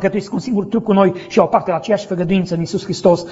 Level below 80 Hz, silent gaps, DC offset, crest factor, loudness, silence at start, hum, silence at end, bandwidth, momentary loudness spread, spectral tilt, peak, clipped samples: -50 dBFS; none; under 0.1%; 16 dB; -17 LUFS; 0 s; none; 0 s; 8 kHz; 6 LU; -6 dB/octave; 0 dBFS; under 0.1%